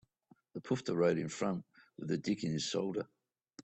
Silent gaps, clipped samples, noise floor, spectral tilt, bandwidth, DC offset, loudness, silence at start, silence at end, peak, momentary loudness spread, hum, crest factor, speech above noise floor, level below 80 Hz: none; under 0.1%; -69 dBFS; -5.5 dB/octave; 8.4 kHz; under 0.1%; -36 LUFS; 0.55 s; 0 s; -18 dBFS; 17 LU; none; 20 dB; 34 dB; -72 dBFS